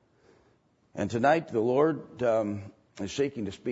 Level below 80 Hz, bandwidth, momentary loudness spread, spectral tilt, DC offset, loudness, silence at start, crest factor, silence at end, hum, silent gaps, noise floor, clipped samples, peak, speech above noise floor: -66 dBFS; 8 kHz; 15 LU; -6 dB/octave; under 0.1%; -28 LUFS; 0.95 s; 18 dB; 0 s; none; none; -66 dBFS; under 0.1%; -10 dBFS; 39 dB